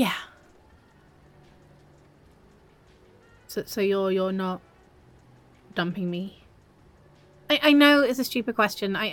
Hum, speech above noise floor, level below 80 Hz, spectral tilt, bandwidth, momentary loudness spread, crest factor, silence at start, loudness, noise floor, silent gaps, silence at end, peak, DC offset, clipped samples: none; 33 dB; -62 dBFS; -4.5 dB/octave; 17.5 kHz; 18 LU; 22 dB; 0 s; -24 LUFS; -56 dBFS; none; 0 s; -4 dBFS; under 0.1%; under 0.1%